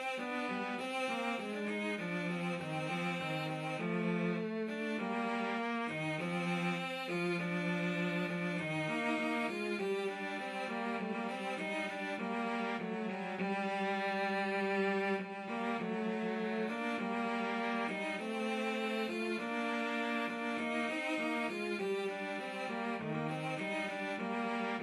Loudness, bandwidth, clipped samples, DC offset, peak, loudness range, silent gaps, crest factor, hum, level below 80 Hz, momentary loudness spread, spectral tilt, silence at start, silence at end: -37 LUFS; 13.5 kHz; under 0.1%; under 0.1%; -22 dBFS; 2 LU; none; 14 dB; none; -86 dBFS; 4 LU; -6 dB/octave; 0 s; 0 s